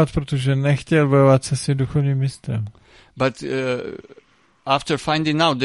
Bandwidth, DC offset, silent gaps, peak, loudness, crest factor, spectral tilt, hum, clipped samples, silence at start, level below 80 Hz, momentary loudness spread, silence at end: 11.5 kHz; under 0.1%; none; -2 dBFS; -20 LUFS; 18 dB; -6 dB/octave; none; under 0.1%; 0 s; -46 dBFS; 12 LU; 0 s